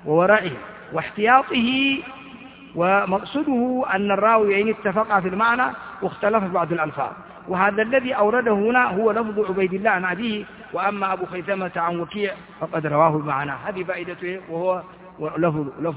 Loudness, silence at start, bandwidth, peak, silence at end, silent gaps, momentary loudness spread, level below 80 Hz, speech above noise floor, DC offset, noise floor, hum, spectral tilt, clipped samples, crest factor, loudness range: -21 LUFS; 0 s; 4 kHz; -2 dBFS; 0 s; none; 12 LU; -58 dBFS; 20 dB; under 0.1%; -42 dBFS; none; -9.5 dB/octave; under 0.1%; 20 dB; 4 LU